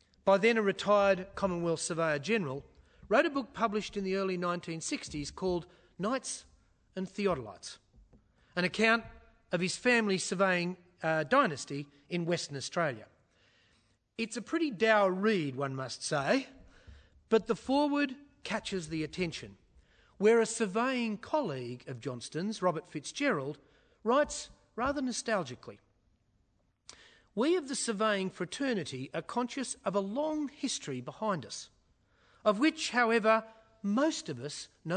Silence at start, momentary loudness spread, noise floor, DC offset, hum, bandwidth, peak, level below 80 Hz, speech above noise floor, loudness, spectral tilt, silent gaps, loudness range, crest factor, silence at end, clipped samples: 0.25 s; 14 LU; -73 dBFS; under 0.1%; none; 9.6 kHz; -12 dBFS; -64 dBFS; 42 dB; -32 LUFS; -4.5 dB/octave; none; 5 LU; 20 dB; 0 s; under 0.1%